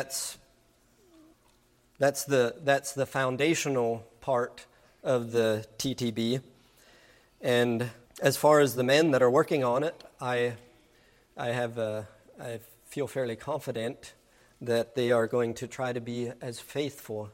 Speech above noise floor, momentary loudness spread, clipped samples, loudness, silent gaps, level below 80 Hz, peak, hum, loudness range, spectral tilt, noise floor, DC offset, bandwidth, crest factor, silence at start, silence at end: 37 dB; 15 LU; under 0.1%; -29 LUFS; none; -68 dBFS; -8 dBFS; none; 9 LU; -4.5 dB/octave; -65 dBFS; under 0.1%; 16 kHz; 22 dB; 0 s; 0.05 s